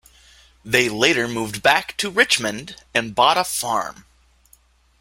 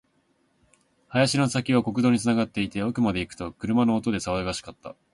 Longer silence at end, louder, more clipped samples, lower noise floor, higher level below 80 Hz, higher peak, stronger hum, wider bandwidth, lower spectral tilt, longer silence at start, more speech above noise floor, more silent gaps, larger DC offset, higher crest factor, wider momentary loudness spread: first, 1.1 s vs 0.2 s; first, -19 LUFS vs -25 LUFS; neither; second, -56 dBFS vs -68 dBFS; about the same, -54 dBFS vs -52 dBFS; first, 0 dBFS vs -8 dBFS; neither; first, 16.5 kHz vs 11.5 kHz; second, -2.5 dB/octave vs -5.5 dB/octave; second, 0.65 s vs 1.1 s; second, 36 dB vs 43 dB; neither; neither; about the same, 22 dB vs 18 dB; second, 8 LU vs 12 LU